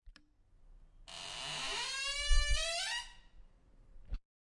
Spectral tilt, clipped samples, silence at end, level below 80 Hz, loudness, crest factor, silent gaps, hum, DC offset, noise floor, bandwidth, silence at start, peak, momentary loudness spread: -1 dB/octave; under 0.1%; 0.3 s; -40 dBFS; -36 LUFS; 20 dB; none; none; under 0.1%; -65 dBFS; 11.5 kHz; 0.05 s; -16 dBFS; 18 LU